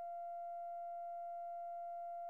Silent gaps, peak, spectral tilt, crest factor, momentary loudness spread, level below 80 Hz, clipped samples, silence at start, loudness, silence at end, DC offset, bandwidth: none; -42 dBFS; -3.5 dB/octave; 4 dB; 0 LU; under -90 dBFS; under 0.1%; 0 s; -47 LUFS; 0 s; under 0.1%; 2.9 kHz